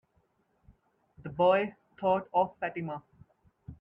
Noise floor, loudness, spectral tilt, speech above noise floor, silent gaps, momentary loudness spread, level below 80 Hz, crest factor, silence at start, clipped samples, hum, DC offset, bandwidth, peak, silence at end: -72 dBFS; -30 LUFS; -8.5 dB/octave; 44 dB; none; 18 LU; -66 dBFS; 18 dB; 1.2 s; under 0.1%; none; under 0.1%; 4.4 kHz; -14 dBFS; 0.05 s